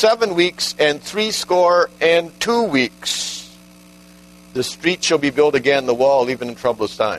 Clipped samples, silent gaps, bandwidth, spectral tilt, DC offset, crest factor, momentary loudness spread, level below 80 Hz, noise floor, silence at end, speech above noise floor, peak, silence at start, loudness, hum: under 0.1%; none; 13.5 kHz; -3 dB/octave; under 0.1%; 16 dB; 7 LU; -56 dBFS; -45 dBFS; 0 s; 27 dB; -2 dBFS; 0 s; -17 LUFS; 60 Hz at -45 dBFS